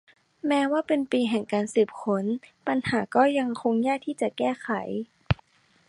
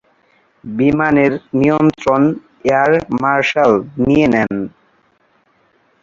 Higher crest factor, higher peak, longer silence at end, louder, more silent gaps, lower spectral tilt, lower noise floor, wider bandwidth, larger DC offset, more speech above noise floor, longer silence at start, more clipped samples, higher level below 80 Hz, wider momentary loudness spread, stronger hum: first, 22 dB vs 14 dB; second, -4 dBFS vs 0 dBFS; second, 0.55 s vs 1.35 s; second, -26 LUFS vs -14 LUFS; neither; about the same, -6 dB/octave vs -7 dB/octave; about the same, -60 dBFS vs -57 dBFS; first, 11.5 kHz vs 7.6 kHz; neither; second, 35 dB vs 44 dB; second, 0.45 s vs 0.65 s; neither; about the same, -50 dBFS vs -46 dBFS; about the same, 7 LU vs 8 LU; neither